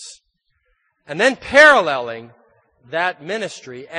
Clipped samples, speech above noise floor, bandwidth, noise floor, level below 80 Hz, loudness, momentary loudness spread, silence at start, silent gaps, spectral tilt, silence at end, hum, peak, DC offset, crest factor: under 0.1%; 51 dB; 10 kHz; -68 dBFS; -56 dBFS; -15 LUFS; 22 LU; 0 s; none; -3 dB/octave; 0 s; none; 0 dBFS; under 0.1%; 18 dB